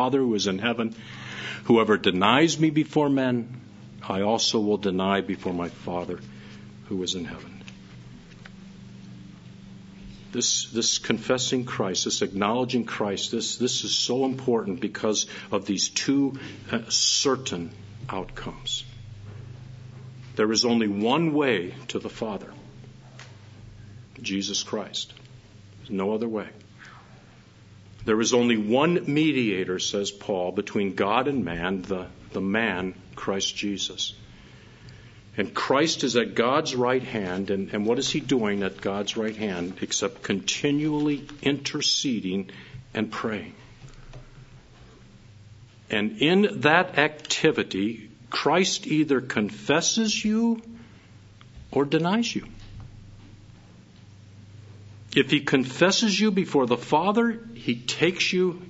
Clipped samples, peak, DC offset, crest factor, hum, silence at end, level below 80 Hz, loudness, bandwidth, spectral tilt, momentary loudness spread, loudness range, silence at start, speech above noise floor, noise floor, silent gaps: under 0.1%; -2 dBFS; under 0.1%; 24 dB; none; 0 s; -56 dBFS; -25 LUFS; 8 kHz; -3.5 dB/octave; 22 LU; 10 LU; 0 s; 26 dB; -51 dBFS; none